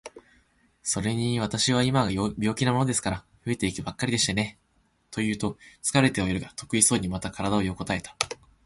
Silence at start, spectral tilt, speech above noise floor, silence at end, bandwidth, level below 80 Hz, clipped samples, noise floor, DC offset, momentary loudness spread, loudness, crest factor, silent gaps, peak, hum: 0.05 s; -4 dB/octave; 42 dB; 0.3 s; 12 kHz; -50 dBFS; under 0.1%; -68 dBFS; under 0.1%; 10 LU; -26 LUFS; 26 dB; none; 0 dBFS; none